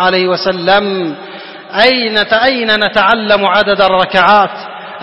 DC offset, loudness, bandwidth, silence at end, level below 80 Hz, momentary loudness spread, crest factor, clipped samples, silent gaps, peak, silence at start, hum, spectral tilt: 0.4%; -10 LUFS; 11 kHz; 0 s; -44 dBFS; 14 LU; 12 dB; 0.2%; none; 0 dBFS; 0 s; none; -5.5 dB/octave